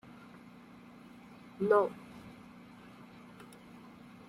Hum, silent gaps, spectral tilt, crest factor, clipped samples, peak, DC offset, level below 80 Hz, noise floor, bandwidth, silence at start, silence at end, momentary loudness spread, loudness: none; none; -7 dB/octave; 24 dB; under 0.1%; -14 dBFS; under 0.1%; -74 dBFS; -54 dBFS; 13.5 kHz; 1.6 s; 1.95 s; 25 LU; -31 LUFS